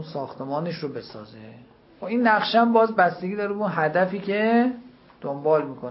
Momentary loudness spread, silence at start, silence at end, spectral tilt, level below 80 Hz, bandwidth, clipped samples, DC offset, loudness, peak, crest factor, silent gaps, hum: 18 LU; 0 s; 0 s; -10 dB/octave; -68 dBFS; 5.8 kHz; under 0.1%; under 0.1%; -23 LUFS; -6 dBFS; 18 dB; none; none